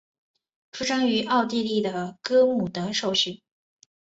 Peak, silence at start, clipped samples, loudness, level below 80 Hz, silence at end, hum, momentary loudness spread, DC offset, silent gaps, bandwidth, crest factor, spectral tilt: -8 dBFS; 0.75 s; under 0.1%; -24 LUFS; -66 dBFS; 0.7 s; none; 10 LU; under 0.1%; none; 8 kHz; 16 dB; -4 dB/octave